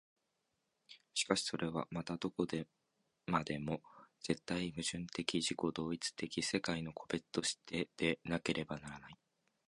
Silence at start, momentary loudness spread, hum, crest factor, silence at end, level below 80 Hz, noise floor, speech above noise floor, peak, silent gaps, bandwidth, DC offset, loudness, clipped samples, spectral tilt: 0.9 s; 9 LU; none; 26 dB; 0.55 s; -66 dBFS; -85 dBFS; 45 dB; -16 dBFS; none; 11.5 kHz; under 0.1%; -39 LUFS; under 0.1%; -4 dB/octave